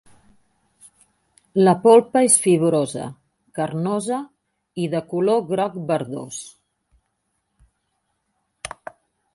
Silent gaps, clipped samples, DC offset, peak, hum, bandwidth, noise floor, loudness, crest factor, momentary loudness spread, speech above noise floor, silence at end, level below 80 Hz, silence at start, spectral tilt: none; under 0.1%; under 0.1%; 0 dBFS; none; 11.5 kHz; -73 dBFS; -19 LUFS; 22 dB; 22 LU; 55 dB; 0.7 s; -64 dBFS; 1.55 s; -5 dB/octave